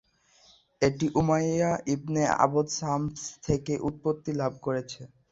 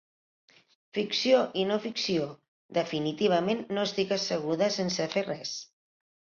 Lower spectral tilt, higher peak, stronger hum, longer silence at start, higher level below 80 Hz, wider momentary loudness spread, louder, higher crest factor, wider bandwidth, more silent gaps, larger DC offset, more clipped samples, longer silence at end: about the same, -5.5 dB/octave vs -4.5 dB/octave; first, -6 dBFS vs -10 dBFS; neither; second, 0.8 s vs 0.95 s; first, -54 dBFS vs -72 dBFS; about the same, 8 LU vs 10 LU; about the same, -28 LUFS vs -29 LUFS; about the same, 22 dB vs 20 dB; about the same, 8 kHz vs 7.4 kHz; second, none vs 2.48-2.69 s; neither; neither; second, 0.25 s vs 0.65 s